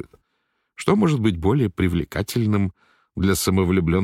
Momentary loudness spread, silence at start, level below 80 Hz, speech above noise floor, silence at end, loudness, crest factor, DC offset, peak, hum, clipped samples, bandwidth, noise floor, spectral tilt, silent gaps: 8 LU; 0.8 s; -40 dBFS; 53 dB; 0 s; -21 LUFS; 16 dB; under 0.1%; -4 dBFS; none; under 0.1%; 16.5 kHz; -72 dBFS; -6 dB/octave; none